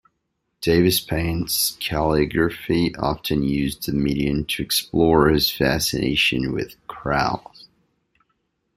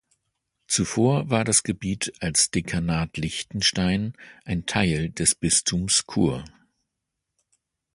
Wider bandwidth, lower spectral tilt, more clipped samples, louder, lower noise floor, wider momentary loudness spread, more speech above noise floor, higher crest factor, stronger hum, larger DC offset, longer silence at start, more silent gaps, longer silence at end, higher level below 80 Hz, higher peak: first, 16 kHz vs 11.5 kHz; about the same, -4.5 dB/octave vs -3.5 dB/octave; neither; about the same, -21 LUFS vs -23 LUFS; second, -75 dBFS vs -82 dBFS; about the same, 7 LU vs 9 LU; second, 54 dB vs 58 dB; about the same, 18 dB vs 20 dB; neither; neither; about the same, 0.6 s vs 0.7 s; neither; about the same, 1.35 s vs 1.45 s; first, -40 dBFS vs -46 dBFS; about the same, -2 dBFS vs -4 dBFS